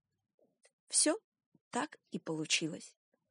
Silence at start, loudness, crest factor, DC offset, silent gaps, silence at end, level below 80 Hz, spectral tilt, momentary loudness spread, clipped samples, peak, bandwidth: 0.9 s; -34 LUFS; 22 dB; under 0.1%; 1.24-1.32 s, 1.46-1.52 s, 1.61-1.71 s; 0.4 s; under -90 dBFS; -2 dB/octave; 13 LU; under 0.1%; -16 dBFS; 11 kHz